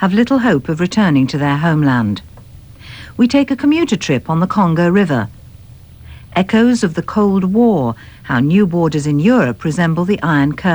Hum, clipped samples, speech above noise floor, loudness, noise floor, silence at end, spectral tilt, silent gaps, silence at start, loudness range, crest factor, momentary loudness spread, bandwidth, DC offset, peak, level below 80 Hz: none; under 0.1%; 25 dB; -14 LUFS; -38 dBFS; 0 s; -7 dB/octave; none; 0 s; 2 LU; 12 dB; 7 LU; over 20 kHz; 0.2%; -2 dBFS; -42 dBFS